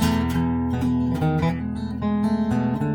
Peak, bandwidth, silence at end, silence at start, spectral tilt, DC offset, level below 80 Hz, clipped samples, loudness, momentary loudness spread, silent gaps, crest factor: -10 dBFS; 19.5 kHz; 0 s; 0 s; -7.5 dB/octave; under 0.1%; -38 dBFS; under 0.1%; -23 LUFS; 4 LU; none; 12 dB